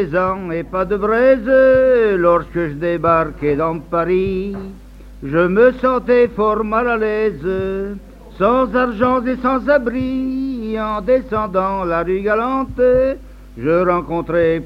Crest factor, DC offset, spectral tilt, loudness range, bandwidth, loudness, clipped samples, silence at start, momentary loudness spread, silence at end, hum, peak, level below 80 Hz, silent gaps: 16 dB; under 0.1%; -8.5 dB/octave; 3 LU; 5.6 kHz; -16 LUFS; under 0.1%; 0 s; 10 LU; 0 s; none; -2 dBFS; -36 dBFS; none